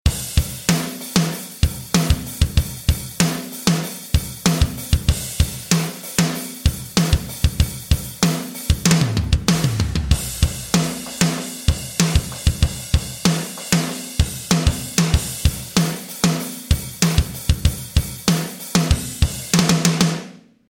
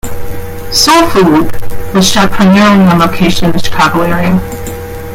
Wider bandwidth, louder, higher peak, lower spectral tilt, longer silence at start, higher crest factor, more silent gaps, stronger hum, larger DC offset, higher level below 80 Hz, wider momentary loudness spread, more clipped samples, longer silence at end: about the same, 17 kHz vs 16.5 kHz; second, -20 LUFS vs -8 LUFS; about the same, 0 dBFS vs 0 dBFS; about the same, -4.5 dB/octave vs -4.5 dB/octave; about the same, 0.05 s vs 0.05 s; first, 20 dB vs 8 dB; neither; neither; neither; about the same, -26 dBFS vs -26 dBFS; second, 5 LU vs 17 LU; second, under 0.1% vs 0.1%; first, 0.35 s vs 0 s